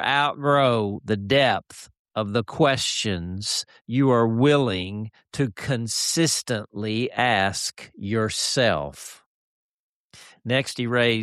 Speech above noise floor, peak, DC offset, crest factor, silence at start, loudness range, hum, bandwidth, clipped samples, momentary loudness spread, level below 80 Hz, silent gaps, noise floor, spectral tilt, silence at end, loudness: 28 dB; -8 dBFS; under 0.1%; 16 dB; 0 s; 3 LU; none; 13.5 kHz; under 0.1%; 13 LU; -56 dBFS; 1.99-2.05 s, 3.81-3.85 s, 9.26-10.10 s; -51 dBFS; -4 dB/octave; 0 s; -23 LUFS